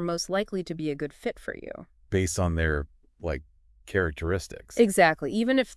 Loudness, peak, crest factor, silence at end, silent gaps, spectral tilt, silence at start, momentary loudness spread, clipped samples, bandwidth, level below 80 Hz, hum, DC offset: -27 LUFS; -6 dBFS; 22 dB; 0 s; none; -5 dB/octave; 0 s; 16 LU; under 0.1%; 12 kHz; -44 dBFS; none; under 0.1%